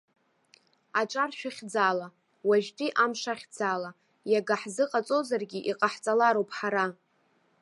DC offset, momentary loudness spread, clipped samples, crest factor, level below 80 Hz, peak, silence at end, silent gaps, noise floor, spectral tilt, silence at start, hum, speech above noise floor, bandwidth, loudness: under 0.1%; 9 LU; under 0.1%; 20 dB; -84 dBFS; -10 dBFS; 0.7 s; none; -69 dBFS; -4 dB/octave; 0.95 s; none; 41 dB; 11.5 kHz; -29 LUFS